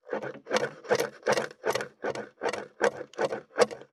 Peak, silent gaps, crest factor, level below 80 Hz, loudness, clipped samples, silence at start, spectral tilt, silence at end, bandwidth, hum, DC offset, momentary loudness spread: -8 dBFS; none; 22 dB; -76 dBFS; -31 LUFS; under 0.1%; 0.05 s; -3 dB/octave; 0.1 s; 14.5 kHz; none; under 0.1%; 8 LU